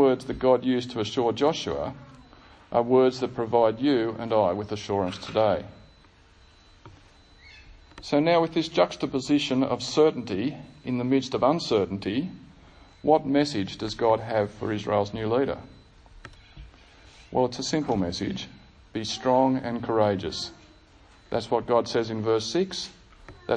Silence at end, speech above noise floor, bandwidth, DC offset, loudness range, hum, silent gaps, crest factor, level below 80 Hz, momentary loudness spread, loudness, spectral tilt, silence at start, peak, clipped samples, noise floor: 0 s; 31 dB; 10 kHz; under 0.1%; 5 LU; none; none; 20 dB; -54 dBFS; 10 LU; -26 LUFS; -5.5 dB/octave; 0 s; -6 dBFS; under 0.1%; -55 dBFS